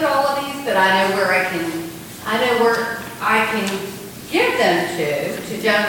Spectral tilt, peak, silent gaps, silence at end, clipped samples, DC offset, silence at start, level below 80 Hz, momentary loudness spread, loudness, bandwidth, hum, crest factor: -3.5 dB/octave; -2 dBFS; none; 0 s; under 0.1%; under 0.1%; 0 s; -56 dBFS; 11 LU; -18 LUFS; 17.5 kHz; none; 16 dB